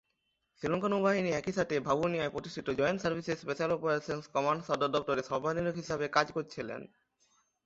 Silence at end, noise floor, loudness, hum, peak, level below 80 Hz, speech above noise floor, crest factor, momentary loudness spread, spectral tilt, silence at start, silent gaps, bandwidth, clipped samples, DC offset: 0.8 s; -80 dBFS; -33 LUFS; none; -10 dBFS; -64 dBFS; 48 dB; 22 dB; 8 LU; -5.5 dB/octave; 0.6 s; none; 8 kHz; under 0.1%; under 0.1%